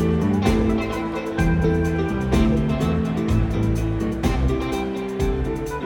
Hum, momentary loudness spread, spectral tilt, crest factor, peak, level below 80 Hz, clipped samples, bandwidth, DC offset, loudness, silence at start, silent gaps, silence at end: none; 6 LU; -7.5 dB/octave; 14 dB; -6 dBFS; -28 dBFS; under 0.1%; 17.5 kHz; under 0.1%; -22 LUFS; 0 s; none; 0 s